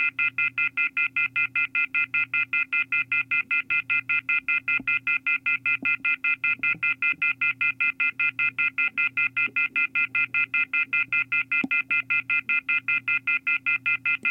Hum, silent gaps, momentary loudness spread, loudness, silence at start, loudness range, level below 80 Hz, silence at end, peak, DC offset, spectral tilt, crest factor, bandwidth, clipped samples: none; none; 1 LU; -23 LUFS; 0 s; 0 LU; -74 dBFS; 0 s; -12 dBFS; under 0.1%; -3.5 dB/octave; 12 dB; 5.6 kHz; under 0.1%